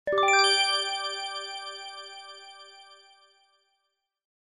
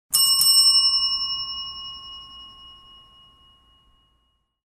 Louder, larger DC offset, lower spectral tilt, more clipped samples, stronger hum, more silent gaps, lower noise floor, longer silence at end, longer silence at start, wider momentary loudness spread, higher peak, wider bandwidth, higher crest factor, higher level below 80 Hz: second, -24 LUFS vs -16 LUFS; neither; first, 1 dB/octave vs 3 dB/octave; neither; neither; neither; first, -80 dBFS vs -69 dBFS; second, 1.5 s vs 1.95 s; about the same, 0.05 s vs 0.1 s; about the same, 25 LU vs 25 LU; second, -10 dBFS vs -6 dBFS; second, 13 kHz vs 15.5 kHz; about the same, 20 dB vs 18 dB; second, -74 dBFS vs -58 dBFS